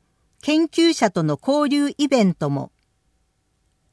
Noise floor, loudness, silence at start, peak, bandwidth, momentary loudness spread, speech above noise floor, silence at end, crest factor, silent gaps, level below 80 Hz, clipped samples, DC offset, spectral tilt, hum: -67 dBFS; -20 LUFS; 0.45 s; -4 dBFS; 11 kHz; 10 LU; 48 dB; 1.25 s; 16 dB; none; -64 dBFS; under 0.1%; under 0.1%; -5.5 dB/octave; none